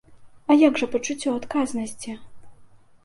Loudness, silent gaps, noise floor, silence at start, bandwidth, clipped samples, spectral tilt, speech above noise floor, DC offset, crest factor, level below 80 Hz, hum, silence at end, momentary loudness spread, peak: -22 LUFS; none; -49 dBFS; 0.1 s; 11.5 kHz; under 0.1%; -4 dB/octave; 27 dB; under 0.1%; 18 dB; -58 dBFS; none; 0.4 s; 19 LU; -6 dBFS